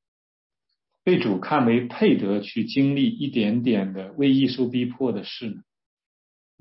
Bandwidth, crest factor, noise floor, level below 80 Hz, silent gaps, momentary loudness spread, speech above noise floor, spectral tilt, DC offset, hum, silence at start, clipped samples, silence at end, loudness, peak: 5.8 kHz; 16 dB; -79 dBFS; -70 dBFS; none; 10 LU; 57 dB; -10.5 dB/octave; under 0.1%; none; 1.05 s; under 0.1%; 1 s; -23 LUFS; -8 dBFS